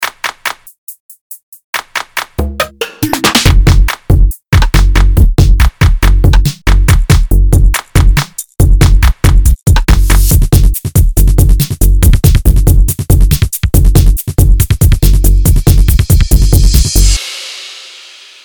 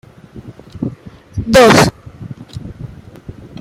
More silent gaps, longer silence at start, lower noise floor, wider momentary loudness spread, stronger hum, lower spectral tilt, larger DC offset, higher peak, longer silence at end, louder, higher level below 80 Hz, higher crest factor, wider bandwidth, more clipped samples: first, 0.78-0.87 s, 1.00-1.09 s, 1.21-1.30 s, 1.43-1.52 s, 1.64-1.73 s vs none; second, 0 s vs 0.35 s; about the same, -34 dBFS vs -35 dBFS; second, 12 LU vs 28 LU; neither; about the same, -5 dB/octave vs -4.5 dB/octave; neither; about the same, 0 dBFS vs 0 dBFS; first, 0.6 s vs 0.3 s; about the same, -10 LUFS vs -11 LUFS; first, -8 dBFS vs -38 dBFS; second, 8 dB vs 16 dB; first, over 20 kHz vs 16 kHz; first, 6% vs under 0.1%